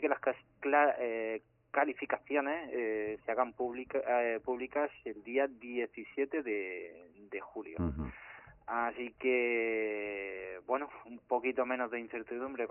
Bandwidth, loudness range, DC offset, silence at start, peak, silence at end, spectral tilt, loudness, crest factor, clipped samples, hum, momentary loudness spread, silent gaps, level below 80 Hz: 3.2 kHz; 5 LU; under 0.1%; 0 s; -16 dBFS; 0 s; -0.5 dB/octave; -35 LUFS; 20 dB; under 0.1%; none; 12 LU; none; -60 dBFS